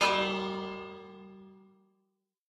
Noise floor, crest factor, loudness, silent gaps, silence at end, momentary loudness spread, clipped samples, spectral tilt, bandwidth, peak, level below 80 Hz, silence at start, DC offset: -80 dBFS; 22 dB; -32 LUFS; none; 0.9 s; 23 LU; under 0.1%; -3.5 dB/octave; 13 kHz; -14 dBFS; -68 dBFS; 0 s; under 0.1%